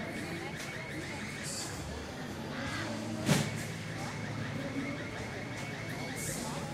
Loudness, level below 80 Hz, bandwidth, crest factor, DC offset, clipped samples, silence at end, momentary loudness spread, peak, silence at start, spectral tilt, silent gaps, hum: -37 LUFS; -56 dBFS; 16 kHz; 22 dB; under 0.1%; under 0.1%; 0 s; 8 LU; -16 dBFS; 0 s; -4.5 dB/octave; none; none